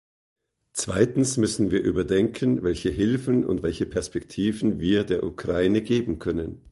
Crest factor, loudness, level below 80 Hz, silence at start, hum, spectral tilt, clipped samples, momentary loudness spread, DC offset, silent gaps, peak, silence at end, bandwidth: 20 dB; -24 LUFS; -44 dBFS; 0.75 s; none; -5.5 dB/octave; under 0.1%; 6 LU; under 0.1%; none; -4 dBFS; 0 s; 11.5 kHz